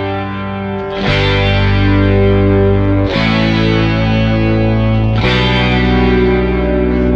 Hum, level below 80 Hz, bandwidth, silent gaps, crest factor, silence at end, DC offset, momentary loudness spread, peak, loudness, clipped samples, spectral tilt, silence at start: none; -20 dBFS; 7 kHz; none; 10 dB; 0 s; under 0.1%; 7 LU; 0 dBFS; -12 LUFS; under 0.1%; -8 dB/octave; 0 s